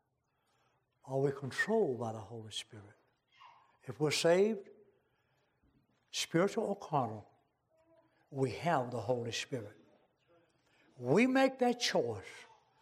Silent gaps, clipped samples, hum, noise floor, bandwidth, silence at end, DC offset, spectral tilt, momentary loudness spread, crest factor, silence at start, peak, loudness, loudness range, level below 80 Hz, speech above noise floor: none; under 0.1%; none; -80 dBFS; 15.5 kHz; 0.35 s; under 0.1%; -4.5 dB/octave; 18 LU; 20 dB; 1.05 s; -18 dBFS; -34 LUFS; 5 LU; -80 dBFS; 46 dB